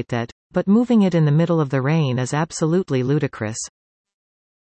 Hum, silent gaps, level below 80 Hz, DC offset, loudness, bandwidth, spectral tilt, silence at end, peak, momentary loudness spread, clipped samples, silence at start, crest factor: none; 0.32-0.50 s; -58 dBFS; under 0.1%; -20 LUFS; 8.8 kHz; -6.5 dB/octave; 0.95 s; -6 dBFS; 11 LU; under 0.1%; 0 s; 14 dB